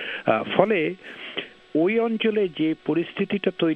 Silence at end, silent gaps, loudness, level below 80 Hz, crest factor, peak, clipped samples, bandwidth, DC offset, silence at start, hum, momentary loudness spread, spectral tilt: 0 s; none; -24 LUFS; -68 dBFS; 22 dB; -2 dBFS; under 0.1%; 5.4 kHz; under 0.1%; 0 s; none; 12 LU; -8 dB/octave